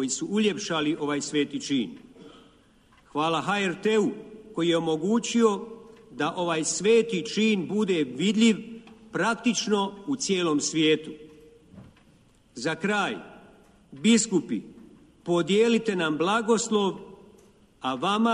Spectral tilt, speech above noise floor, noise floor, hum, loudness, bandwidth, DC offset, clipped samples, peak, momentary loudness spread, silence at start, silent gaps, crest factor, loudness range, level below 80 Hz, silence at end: -4 dB/octave; 34 dB; -59 dBFS; none; -25 LUFS; 11 kHz; under 0.1%; under 0.1%; -10 dBFS; 13 LU; 0 s; none; 16 dB; 4 LU; -66 dBFS; 0 s